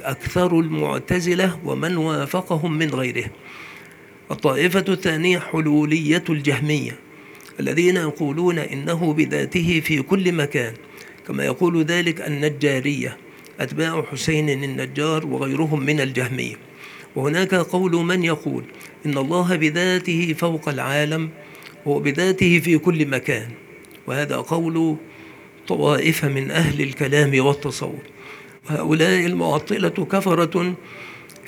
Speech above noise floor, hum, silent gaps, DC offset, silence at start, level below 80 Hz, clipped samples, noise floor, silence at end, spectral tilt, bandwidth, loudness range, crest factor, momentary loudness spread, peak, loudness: 24 dB; none; none; under 0.1%; 0 s; -54 dBFS; under 0.1%; -44 dBFS; 0 s; -5.5 dB/octave; over 20 kHz; 3 LU; 20 dB; 17 LU; -2 dBFS; -21 LUFS